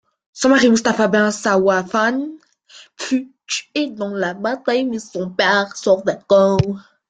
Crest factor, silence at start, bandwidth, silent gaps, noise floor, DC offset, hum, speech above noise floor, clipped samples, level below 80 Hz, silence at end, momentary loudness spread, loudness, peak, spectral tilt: 16 dB; 0.35 s; 9.4 kHz; none; -46 dBFS; under 0.1%; none; 29 dB; under 0.1%; -52 dBFS; 0.3 s; 11 LU; -18 LUFS; -2 dBFS; -4.5 dB/octave